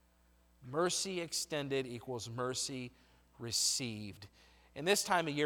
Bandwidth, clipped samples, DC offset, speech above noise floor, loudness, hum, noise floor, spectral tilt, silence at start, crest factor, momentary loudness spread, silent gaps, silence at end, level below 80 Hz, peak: over 20 kHz; under 0.1%; under 0.1%; 32 dB; -36 LUFS; none; -69 dBFS; -2.5 dB/octave; 0.6 s; 22 dB; 17 LU; none; 0 s; -70 dBFS; -16 dBFS